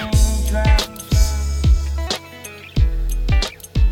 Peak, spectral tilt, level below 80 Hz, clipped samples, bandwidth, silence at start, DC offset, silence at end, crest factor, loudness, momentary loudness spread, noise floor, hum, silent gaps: -4 dBFS; -5 dB/octave; -18 dBFS; under 0.1%; 17 kHz; 0 s; under 0.1%; 0 s; 14 dB; -20 LUFS; 8 LU; -36 dBFS; none; none